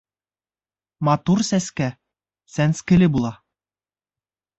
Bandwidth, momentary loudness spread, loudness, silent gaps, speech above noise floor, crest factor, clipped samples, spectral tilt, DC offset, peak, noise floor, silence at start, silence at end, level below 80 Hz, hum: 8.2 kHz; 11 LU; -20 LUFS; none; over 71 dB; 16 dB; under 0.1%; -6 dB/octave; under 0.1%; -6 dBFS; under -90 dBFS; 1 s; 1.25 s; -48 dBFS; none